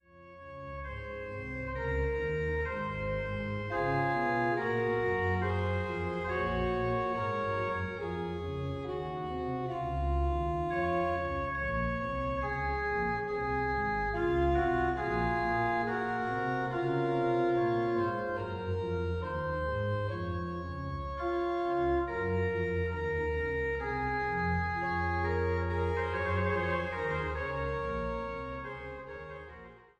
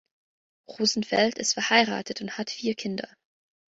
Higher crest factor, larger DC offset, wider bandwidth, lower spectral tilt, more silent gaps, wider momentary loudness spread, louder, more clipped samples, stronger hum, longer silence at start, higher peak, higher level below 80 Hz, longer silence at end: second, 16 dB vs 22 dB; neither; about the same, 8.4 kHz vs 8 kHz; first, -8 dB/octave vs -2.5 dB/octave; neither; second, 8 LU vs 12 LU; second, -33 LUFS vs -26 LUFS; neither; neither; second, 0.15 s vs 0.7 s; second, -16 dBFS vs -6 dBFS; first, -44 dBFS vs -70 dBFS; second, 0.2 s vs 0.65 s